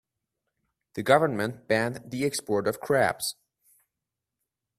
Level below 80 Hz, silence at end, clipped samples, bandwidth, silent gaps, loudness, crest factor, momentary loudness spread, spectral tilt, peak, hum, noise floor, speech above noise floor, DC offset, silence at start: -66 dBFS; 1.45 s; under 0.1%; 16 kHz; none; -26 LUFS; 24 dB; 10 LU; -4.5 dB/octave; -4 dBFS; none; -87 dBFS; 61 dB; under 0.1%; 0.95 s